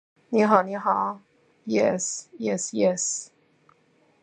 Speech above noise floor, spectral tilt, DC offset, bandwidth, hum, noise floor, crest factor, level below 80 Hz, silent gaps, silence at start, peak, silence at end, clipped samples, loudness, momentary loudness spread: 39 dB; -4 dB/octave; under 0.1%; 9.6 kHz; none; -63 dBFS; 24 dB; -74 dBFS; none; 0.3 s; -2 dBFS; 1 s; under 0.1%; -24 LUFS; 11 LU